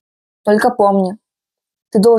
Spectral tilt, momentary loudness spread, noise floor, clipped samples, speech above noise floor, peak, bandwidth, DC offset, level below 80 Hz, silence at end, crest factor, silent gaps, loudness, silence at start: -6.5 dB/octave; 10 LU; -85 dBFS; under 0.1%; 73 dB; -2 dBFS; 14 kHz; under 0.1%; -60 dBFS; 0 s; 14 dB; none; -15 LUFS; 0.45 s